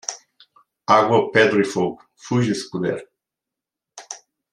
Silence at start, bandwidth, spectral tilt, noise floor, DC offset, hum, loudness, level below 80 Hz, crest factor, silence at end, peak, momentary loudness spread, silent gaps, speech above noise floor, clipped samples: 0.1 s; 11.5 kHz; -5 dB/octave; -86 dBFS; under 0.1%; none; -19 LUFS; -64 dBFS; 20 dB; 0.35 s; -2 dBFS; 21 LU; none; 68 dB; under 0.1%